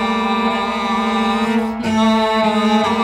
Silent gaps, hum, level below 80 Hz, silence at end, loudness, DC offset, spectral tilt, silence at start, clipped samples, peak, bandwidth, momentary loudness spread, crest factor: none; none; -46 dBFS; 0 s; -16 LUFS; under 0.1%; -5 dB/octave; 0 s; under 0.1%; -4 dBFS; 11.5 kHz; 4 LU; 12 dB